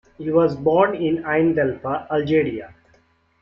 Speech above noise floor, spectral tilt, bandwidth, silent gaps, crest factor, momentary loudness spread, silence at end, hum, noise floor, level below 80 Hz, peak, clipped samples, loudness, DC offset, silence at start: 40 dB; -9 dB/octave; 5.8 kHz; none; 18 dB; 7 LU; 0.75 s; none; -59 dBFS; -56 dBFS; -4 dBFS; under 0.1%; -20 LUFS; under 0.1%; 0.2 s